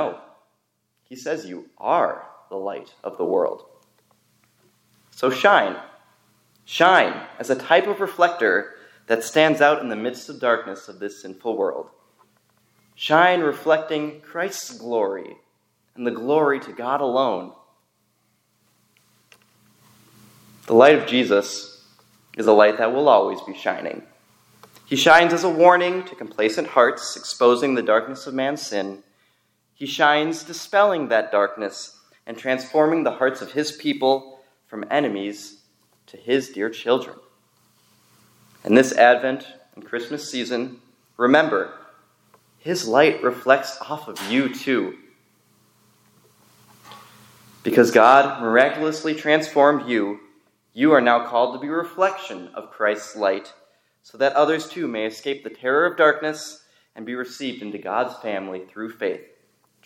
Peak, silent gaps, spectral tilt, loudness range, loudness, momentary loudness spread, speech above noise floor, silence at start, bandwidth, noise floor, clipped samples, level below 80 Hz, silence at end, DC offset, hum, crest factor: 0 dBFS; none; -4 dB/octave; 9 LU; -20 LUFS; 18 LU; 51 dB; 0 s; 17 kHz; -71 dBFS; under 0.1%; -76 dBFS; 0.65 s; under 0.1%; none; 22 dB